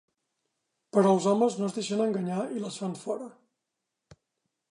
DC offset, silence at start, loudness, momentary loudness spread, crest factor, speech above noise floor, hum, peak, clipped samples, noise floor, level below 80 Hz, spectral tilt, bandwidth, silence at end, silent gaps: under 0.1%; 0.95 s; -28 LUFS; 12 LU; 20 dB; 58 dB; none; -10 dBFS; under 0.1%; -85 dBFS; -78 dBFS; -6 dB/octave; 11 kHz; 1.4 s; none